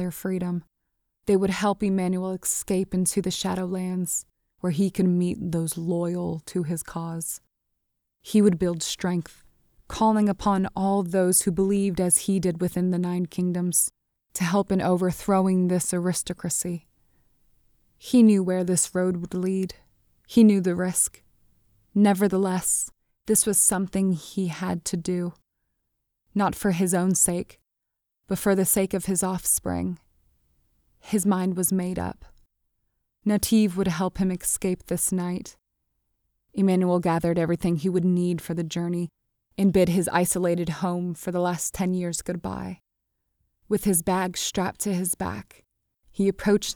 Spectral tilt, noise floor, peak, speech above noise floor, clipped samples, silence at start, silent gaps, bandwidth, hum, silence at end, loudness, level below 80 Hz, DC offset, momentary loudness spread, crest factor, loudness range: -5 dB/octave; -82 dBFS; -6 dBFS; 58 dB; under 0.1%; 0 s; none; 19.5 kHz; none; 0 s; -24 LUFS; -52 dBFS; under 0.1%; 11 LU; 18 dB; 5 LU